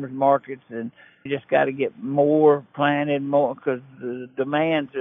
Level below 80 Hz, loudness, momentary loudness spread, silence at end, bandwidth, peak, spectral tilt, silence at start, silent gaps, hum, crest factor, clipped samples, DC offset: -74 dBFS; -22 LUFS; 15 LU; 0 s; 3.8 kHz; -6 dBFS; -9.5 dB/octave; 0 s; none; none; 16 dB; under 0.1%; under 0.1%